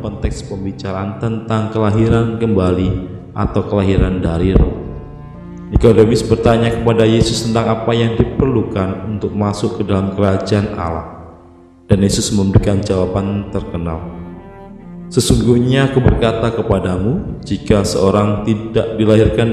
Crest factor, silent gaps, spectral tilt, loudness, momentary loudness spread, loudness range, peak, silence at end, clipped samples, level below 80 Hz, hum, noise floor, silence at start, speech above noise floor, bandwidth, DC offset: 14 dB; none; -6.5 dB/octave; -15 LUFS; 14 LU; 4 LU; 0 dBFS; 0 s; 0.1%; -26 dBFS; none; -42 dBFS; 0 s; 28 dB; 13.5 kHz; under 0.1%